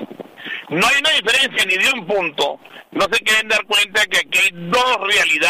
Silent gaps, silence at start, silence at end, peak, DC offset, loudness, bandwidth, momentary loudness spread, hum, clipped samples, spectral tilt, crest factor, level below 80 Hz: none; 0 s; 0 s; -6 dBFS; 0.1%; -15 LUFS; 16 kHz; 15 LU; none; under 0.1%; -1.5 dB/octave; 12 dB; -54 dBFS